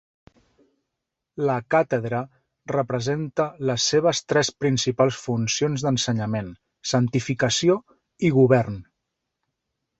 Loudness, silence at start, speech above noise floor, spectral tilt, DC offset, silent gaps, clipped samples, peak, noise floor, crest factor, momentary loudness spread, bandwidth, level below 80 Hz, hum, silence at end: -23 LUFS; 1.35 s; 61 dB; -5 dB/octave; under 0.1%; none; under 0.1%; -4 dBFS; -83 dBFS; 20 dB; 10 LU; 8.2 kHz; -58 dBFS; none; 1.2 s